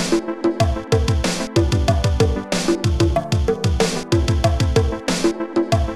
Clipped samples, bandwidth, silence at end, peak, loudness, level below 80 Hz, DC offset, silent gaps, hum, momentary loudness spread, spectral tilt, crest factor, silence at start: under 0.1%; 13.5 kHz; 0 s; -4 dBFS; -19 LUFS; -26 dBFS; under 0.1%; none; none; 3 LU; -5.5 dB/octave; 14 dB; 0 s